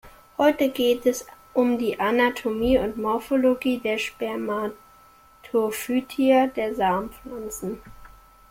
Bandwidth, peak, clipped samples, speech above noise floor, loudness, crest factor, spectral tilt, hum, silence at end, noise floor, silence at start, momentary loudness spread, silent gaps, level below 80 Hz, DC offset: 16.5 kHz; -8 dBFS; under 0.1%; 30 dB; -24 LUFS; 16 dB; -4.5 dB/octave; none; 0.4 s; -53 dBFS; 0.05 s; 12 LU; none; -50 dBFS; under 0.1%